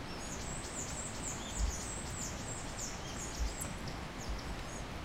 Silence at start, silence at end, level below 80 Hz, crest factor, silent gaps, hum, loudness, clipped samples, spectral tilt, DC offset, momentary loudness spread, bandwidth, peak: 0 s; 0 s; -46 dBFS; 16 dB; none; none; -41 LUFS; under 0.1%; -3 dB/octave; under 0.1%; 5 LU; 16 kHz; -24 dBFS